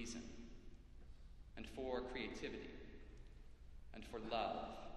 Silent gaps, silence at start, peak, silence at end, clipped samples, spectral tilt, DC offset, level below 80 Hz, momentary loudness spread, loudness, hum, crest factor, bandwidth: none; 0 s; -28 dBFS; 0 s; under 0.1%; -4.5 dB/octave; under 0.1%; -60 dBFS; 20 LU; -48 LUFS; none; 20 dB; 12.5 kHz